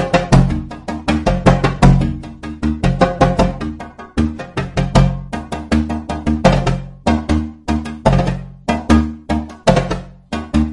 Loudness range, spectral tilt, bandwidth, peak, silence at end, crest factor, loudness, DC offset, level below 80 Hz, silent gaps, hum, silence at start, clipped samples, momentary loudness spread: 2 LU; -7 dB/octave; 11.5 kHz; 0 dBFS; 0 s; 16 dB; -17 LUFS; under 0.1%; -24 dBFS; none; none; 0 s; under 0.1%; 13 LU